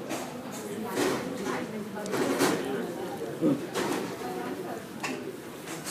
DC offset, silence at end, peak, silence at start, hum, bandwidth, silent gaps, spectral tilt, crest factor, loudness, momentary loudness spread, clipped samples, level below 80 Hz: under 0.1%; 0 s; -12 dBFS; 0 s; none; 15.5 kHz; none; -4.5 dB/octave; 20 dB; -32 LUFS; 10 LU; under 0.1%; -68 dBFS